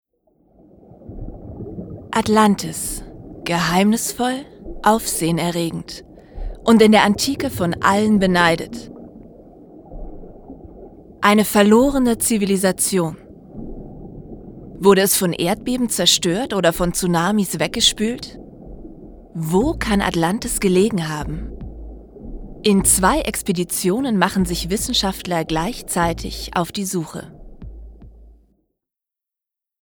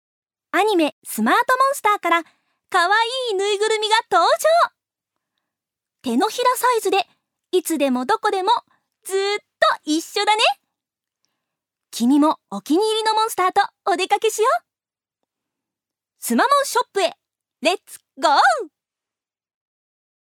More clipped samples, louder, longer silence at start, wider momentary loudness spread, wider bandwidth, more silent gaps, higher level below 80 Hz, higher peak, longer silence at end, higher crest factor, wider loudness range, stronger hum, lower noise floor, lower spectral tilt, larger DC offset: neither; about the same, -18 LUFS vs -19 LUFS; first, 1 s vs 0.55 s; first, 23 LU vs 8 LU; about the same, over 20 kHz vs 19.5 kHz; second, none vs 0.92-1.02 s; first, -38 dBFS vs -82 dBFS; about the same, 0 dBFS vs -2 dBFS; about the same, 1.7 s vs 1.65 s; about the same, 18 dB vs 20 dB; about the same, 6 LU vs 4 LU; neither; about the same, -87 dBFS vs under -90 dBFS; first, -4 dB/octave vs -2 dB/octave; neither